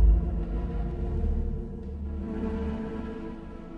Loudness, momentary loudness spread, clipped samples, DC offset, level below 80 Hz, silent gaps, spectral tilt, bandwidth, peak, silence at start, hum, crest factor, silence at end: -33 LUFS; 8 LU; under 0.1%; under 0.1%; -30 dBFS; none; -10 dB/octave; 3.8 kHz; -12 dBFS; 0 s; none; 16 dB; 0 s